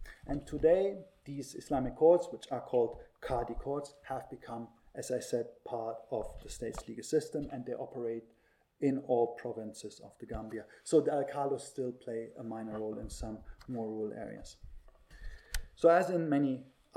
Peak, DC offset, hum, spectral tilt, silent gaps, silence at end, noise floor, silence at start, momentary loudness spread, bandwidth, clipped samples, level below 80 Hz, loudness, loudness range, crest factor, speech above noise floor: -14 dBFS; under 0.1%; none; -6 dB/octave; none; 0.3 s; -53 dBFS; 0 s; 17 LU; 15.5 kHz; under 0.1%; -52 dBFS; -35 LUFS; 8 LU; 22 dB; 19 dB